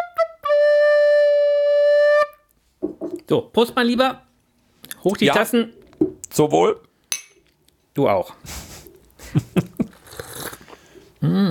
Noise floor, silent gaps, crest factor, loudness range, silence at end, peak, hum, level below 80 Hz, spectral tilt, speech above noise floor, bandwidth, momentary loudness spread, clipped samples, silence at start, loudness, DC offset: -61 dBFS; none; 16 dB; 8 LU; 0 s; -4 dBFS; none; -54 dBFS; -5 dB/octave; 42 dB; 17.5 kHz; 17 LU; under 0.1%; 0 s; -19 LUFS; under 0.1%